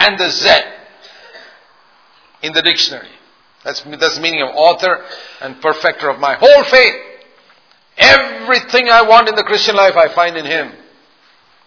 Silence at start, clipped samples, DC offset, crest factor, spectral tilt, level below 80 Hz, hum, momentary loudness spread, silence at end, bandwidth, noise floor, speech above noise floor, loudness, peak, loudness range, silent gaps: 0 s; 0.7%; under 0.1%; 14 dB; -2 dB/octave; -50 dBFS; none; 18 LU; 0.95 s; 5.4 kHz; -50 dBFS; 39 dB; -10 LUFS; 0 dBFS; 7 LU; none